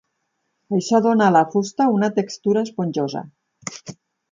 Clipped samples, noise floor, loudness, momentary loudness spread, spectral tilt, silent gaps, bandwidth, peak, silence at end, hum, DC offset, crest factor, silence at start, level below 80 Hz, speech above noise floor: under 0.1%; -73 dBFS; -19 LUFS; 18 LU; -6 dB/octave; none; 7.6 kHz; -4 dBFS; 0.4 s; none; under 0.1%; 16 dB; 0.7 s; -68 dBFS; 54 dB